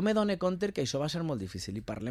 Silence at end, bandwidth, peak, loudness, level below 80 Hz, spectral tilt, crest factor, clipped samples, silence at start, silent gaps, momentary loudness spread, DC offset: 0 s; 14 kHz; -16 dBFS; -32 LUFS; -58 dBFS; -5.5 dB/octave; 16 dB; under 0.1%; 0 s; none; 9 LU; under 0.1%